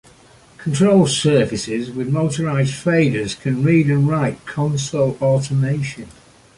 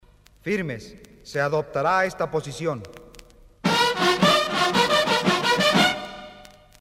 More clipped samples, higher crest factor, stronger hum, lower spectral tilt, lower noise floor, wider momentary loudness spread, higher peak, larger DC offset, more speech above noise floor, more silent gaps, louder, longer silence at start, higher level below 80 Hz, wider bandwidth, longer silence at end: neither; about the same, 16 dB vs 18 dB; neither; first, -6 dB/octave vs -3.5 dB/octave; about the same, -48 dBFS vs -49 dBFS; second, 9 LU vs 16 LU; first, -2 dBFS vs -6 dBFS; neither; first, 31 dB vs 23 dB; neither; first, -18 LUFS vs -21 LUFS; first, 0.6 s vs 0.45 s; about the same, -50 dBFS vs -54 dBFS; second, 11.5 kHz vs 16 kHz; about the same, 0.45 s vs 0.4 s